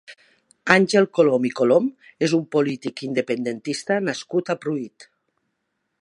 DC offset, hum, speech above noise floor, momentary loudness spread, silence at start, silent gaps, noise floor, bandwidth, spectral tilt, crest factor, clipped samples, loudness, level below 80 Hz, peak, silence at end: under 0.1%; none; 55 dB; 11 LU; 0.1 s; none; -76 dBFS; 11.5 kHz; -5.5 dB/octave; 22 dB; under 0.1%; -21 LUFS; -68 dBFS; 0 dBFS; 1 s